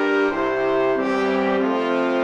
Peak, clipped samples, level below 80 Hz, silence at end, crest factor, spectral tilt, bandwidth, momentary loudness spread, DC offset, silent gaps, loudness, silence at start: -8 dBFS; under 0.1%; -54 dBFS; 0 s; 12 dB; -6 dB/octave; 8.8 kHz; 1 LU; under 0.1%; none; -20 LUFS; 0 s